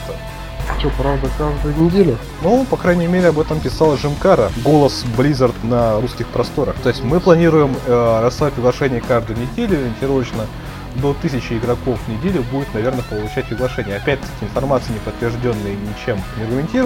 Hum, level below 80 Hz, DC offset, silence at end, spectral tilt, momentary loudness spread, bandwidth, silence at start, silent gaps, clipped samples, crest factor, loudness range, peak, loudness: none; -30 dBFS; under 0.1%; 0 s; -7 dB/octave; 9 LU; 16.5 kHz; 0 s; none; under 0.1%; 16 dB; 6 LU; 0 dBFS; -17 LUFS